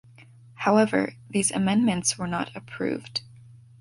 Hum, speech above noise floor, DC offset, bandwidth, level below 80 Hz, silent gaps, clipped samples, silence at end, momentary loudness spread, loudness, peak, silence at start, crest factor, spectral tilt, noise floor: none; 26 dB; under 0.1%; 11.5 kHz; -60 dBFS; none; under 0.1%; 0.4 s; 11 LU; -25 LUFS; -8 dBFS; 0.6 s; 18 dB; -4 dB/octave; -51 dBFS